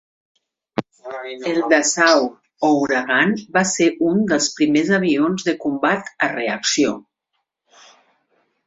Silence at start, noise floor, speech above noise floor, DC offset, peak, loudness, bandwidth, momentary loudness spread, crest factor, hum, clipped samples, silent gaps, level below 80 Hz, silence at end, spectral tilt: 0.75 s; -75 dBFS; 57 dB; under 0.1%; -2 dBFS; -18 LUFS; 8 kHz; 13 LU; 18 dB; none; under 0.1%; none; -62 dBFS; 1.65 s; -3.5 dB/octave